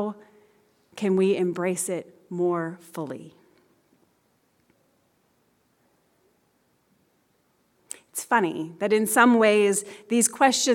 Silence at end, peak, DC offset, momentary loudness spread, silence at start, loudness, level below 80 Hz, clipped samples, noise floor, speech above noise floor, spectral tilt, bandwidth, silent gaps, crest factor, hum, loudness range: 0 s; -4 dBFS; under 0.1%; 19 LU; 0 s; -23 LUFS; -78 dBFS; under 0.1%; -68 dBFS; 45 dB; -3.5 dB/octave; 18 kHz; none; 22 dB; none; 19 LU